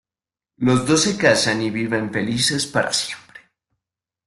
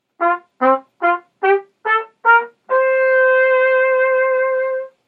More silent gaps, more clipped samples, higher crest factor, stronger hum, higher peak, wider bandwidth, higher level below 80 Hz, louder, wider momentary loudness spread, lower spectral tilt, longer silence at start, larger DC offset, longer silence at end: neither; neither; about the same, 18 dB vs 16 dB; neither; about the same, -2 dBFS vs 0 dBFS; first, 12.5 kHz vs 4.4 kHz; first, -56 dBFS vs -82 dBFS; second, -19 LUFS vs -16 LUFS; about the same, 7 LU vs 6 LU; second, -3.5 dB/octave vs -5 dB/octave; first, 0.6 s vs 0.2 s; neither; first, 0.9 s vs 0.2 s